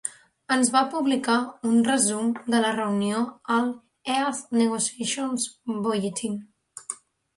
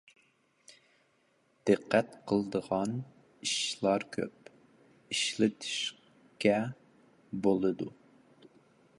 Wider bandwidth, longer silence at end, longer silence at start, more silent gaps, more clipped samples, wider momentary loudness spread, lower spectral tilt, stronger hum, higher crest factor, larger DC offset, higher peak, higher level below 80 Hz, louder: about the same, 11.5 kHz vs 11.5 kHz; second, 0.4 s vs 1.1 s; second, 0.05 s vs 0.7 s; neither; neither; about the same, 14 LU vs 12 LU; about the same, -3.5 dB/octave vs -4 dB/octave; neither; second, 18 dB vs 24 dB; neither; about the same, -8 dBFS vs -10 dBFS; about the same, -70 dBFS vs -72 dBFS; first, -25 LUFS vs -32 LUFS